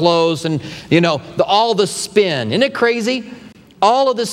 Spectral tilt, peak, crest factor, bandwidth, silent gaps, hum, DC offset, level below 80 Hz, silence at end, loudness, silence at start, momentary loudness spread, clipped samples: -4.5 dB/octave; 0 dBFS; 16 dB; 15.5 kHz; none; none; under 0.1%; -56 dBFS; 0 s; -16 LUFS; 0 s; 7 LU; under 0.1%